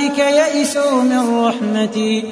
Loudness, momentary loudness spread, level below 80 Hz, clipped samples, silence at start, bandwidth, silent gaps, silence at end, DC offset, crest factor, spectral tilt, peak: -15 LUFS; 4 LU; -66 dBFS; under 0.1%; 0 s; 11 kHz; none; 0 s; under 0.1%; 12 dB; -4 dB/octave; -4 dBFS